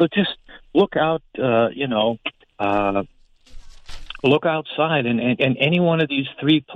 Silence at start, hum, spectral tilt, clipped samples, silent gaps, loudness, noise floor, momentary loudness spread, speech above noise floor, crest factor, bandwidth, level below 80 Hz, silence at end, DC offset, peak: 0 s; none; -7.5 dB/octave; under 0.1%; none; -20 LUFS; -40 dBFS; 9 LU; 20 dB; 16 dB; 8.6 kHz; -46 dBFS; 0 s; under 0.1%; -4 dBFS